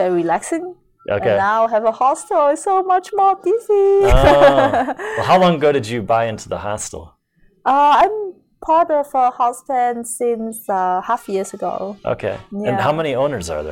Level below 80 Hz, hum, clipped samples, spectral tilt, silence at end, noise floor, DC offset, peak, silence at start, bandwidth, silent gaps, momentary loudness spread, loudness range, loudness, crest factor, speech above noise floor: -32 dBFS; none; under 0.1%; -5 dB/octave; 0 s; -56 dBFS; under 0.1%; 0 dBFS; 0 s; 16 kHz; none; 12 LU; 7 LU; -17 LUFS; 16 dB; 40 dB